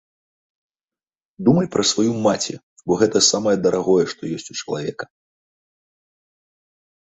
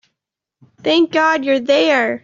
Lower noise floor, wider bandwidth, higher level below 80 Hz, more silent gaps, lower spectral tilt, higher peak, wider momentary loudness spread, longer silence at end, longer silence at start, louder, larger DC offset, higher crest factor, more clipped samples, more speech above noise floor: first, under -90 dBFS vs -81 dBFS; first, 8.4 kHz vs 7.6 kHz; first, -60 dBFS vs -66 dBFS; first, 2.63-2.76 s vs none; about the same, -4 dB/octave vs -3.5 dB/octave; about the same, -2 dBFS vs -2 dBFS; first, 13 LU vs 4 LU; first, 2 s vs 0.05 s; first, 1.4 s vs 0.85 s; second, -19 LUFS vs -15 LUFS; neither; first, 20 dB vs 14 dB; neither; first, over 71 dB vs 66 dB